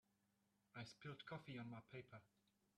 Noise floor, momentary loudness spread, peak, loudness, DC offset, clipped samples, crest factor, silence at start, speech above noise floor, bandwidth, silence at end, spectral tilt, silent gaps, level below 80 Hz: -85 dBFS; 9 LU; -42 dBFS; -57 LUFS; under 0.1%; under 0.1%; 16 dB; 0.75 s; 28 dB; 11.5 kHz; 0.5 s; -6 dB/octave; none; -88 dBFS